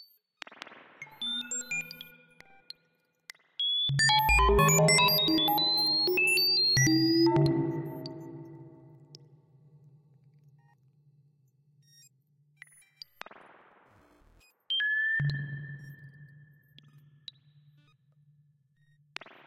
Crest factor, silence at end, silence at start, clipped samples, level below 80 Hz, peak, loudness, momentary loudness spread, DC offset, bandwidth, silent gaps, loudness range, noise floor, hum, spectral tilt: 18 dB; 3.2 s; 0.7 s; under 0.1%; -46 dBFS; -12 dBFS; -25 LUFS; 27 LU; under 0.1%; 16 kHz; none; 15 LU; -73 dBFS; none; -3 dB/octave